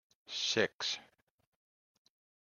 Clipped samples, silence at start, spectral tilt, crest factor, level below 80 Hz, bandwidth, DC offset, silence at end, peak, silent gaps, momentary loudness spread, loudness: under 0.1%; 0.3 s; -2 dB/octave; 26 dB; -84 dBFS; 13 kHz; under 0.1%; 1.4 s; -14 dBFS; 0.74-0.79 s; 11 LU; -35 LUFS